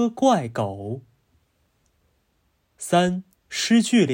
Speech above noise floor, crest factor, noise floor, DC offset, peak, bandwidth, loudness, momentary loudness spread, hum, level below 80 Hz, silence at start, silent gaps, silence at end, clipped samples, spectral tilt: 47 dB; 18 dB; -68 dBFS; under 0.1%; -6 dBFS; 16.5 kHz; -22 LUFS; 16 LU; none; -64 dBFS; 0 s; none; 0 s; under 0.1%; -5 dB/octave